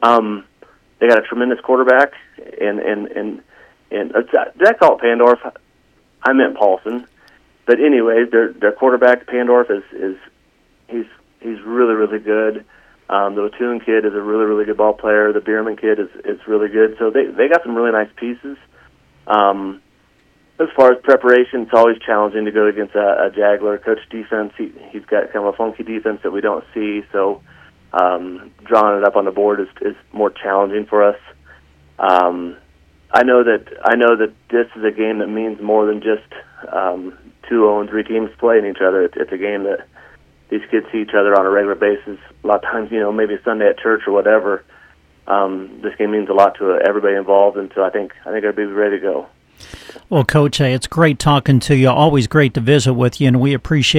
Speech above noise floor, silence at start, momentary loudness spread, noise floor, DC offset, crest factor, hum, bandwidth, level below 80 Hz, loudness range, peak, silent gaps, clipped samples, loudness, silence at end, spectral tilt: 41 dB; 0 s; 13 LU; -56 dBFS; under 0.1%; 16 dB; none; 13 kHz; -50 dBFS; 5 LU; 0 dBFS; none; under 0.1%; -15 LUFS; 0 s; -6.5 dB/octave